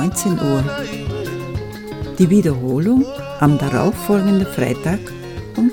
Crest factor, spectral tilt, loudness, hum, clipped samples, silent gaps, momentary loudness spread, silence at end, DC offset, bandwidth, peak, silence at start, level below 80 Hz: 18 dB; -6.5 dB/octave; -18 LUFS; none; under 0.1%; none; 13 LU; 0 s; under 0.1%; 19 kHz; 0 dBFS; 0 s; -38 dBFS